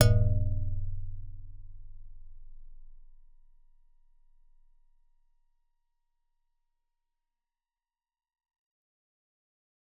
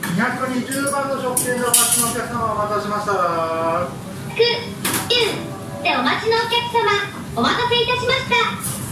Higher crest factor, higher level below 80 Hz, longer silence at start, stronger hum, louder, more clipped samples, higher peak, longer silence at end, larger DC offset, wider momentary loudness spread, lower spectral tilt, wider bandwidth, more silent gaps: first, 28 dB vs 20 dB; first, -40 dBFS vs -48 dBFS; about the same, 0 s vs 0 s; neither; second, -31 LUFS vs -19 LUFS; neither; second, -6 dBFS vs 0 dBFS; first, 6.85 s vs 0 s; neither; first, 28 LU vs 7 LU; first, -8.5 dB/octave vs -2.5 dB/octave; second, 3.9 kHz vs 16 kHz; neither